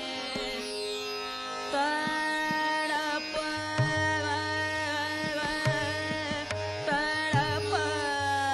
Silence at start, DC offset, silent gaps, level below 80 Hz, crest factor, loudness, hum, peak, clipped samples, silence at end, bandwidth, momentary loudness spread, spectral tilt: 0 s; under 0.1%; none; -54 dBFS; 16 dB; -30 LUFS; none; -14 dBFS; under 0.1%; 0 s; 16 kHz; 6 LU; -4 dB/octave